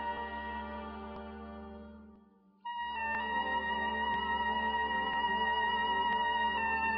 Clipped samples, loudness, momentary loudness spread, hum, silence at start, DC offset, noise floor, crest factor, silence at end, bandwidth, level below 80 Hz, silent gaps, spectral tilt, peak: under 0.1%; -33 LUFS; 16 LU; none; 0 s; under 0.1%; -63 dBFS; 14 dB; 0 s; 5.2 kHz; -56 dBFS; none; -7 dB/octave; -22 dBFS